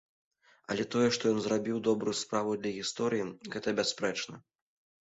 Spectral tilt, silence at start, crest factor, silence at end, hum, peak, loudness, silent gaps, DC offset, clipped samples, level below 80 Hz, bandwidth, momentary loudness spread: -4 dB/octave; 0.7 s; 18 dB; 0.65 s; none; -16 dBFS; -32 LUFS; none; under 0.1%; under 0.1%; -70 dBFS; 8.4 kHz; 9 LU